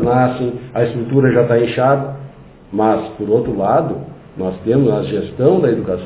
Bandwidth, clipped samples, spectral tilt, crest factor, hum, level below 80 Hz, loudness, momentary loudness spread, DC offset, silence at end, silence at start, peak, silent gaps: 4 kHz; under 0.1%; -12 dB/octave; 16 dB; none; -44 dBFS; -16 LUFS; 11 LU; under 0.1%; 0 s; 0 s; 0 dBFS; none